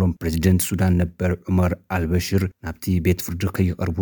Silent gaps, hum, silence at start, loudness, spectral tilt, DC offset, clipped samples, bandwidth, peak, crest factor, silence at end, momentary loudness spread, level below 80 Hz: none; none; 0 s; -22 LUFS; -6.5 dB/octave; under 0.1%; under 0.1%; 19.5 kHz; -6 dBFS; 16 dB; 0 s; 6 LU; -36 dBFS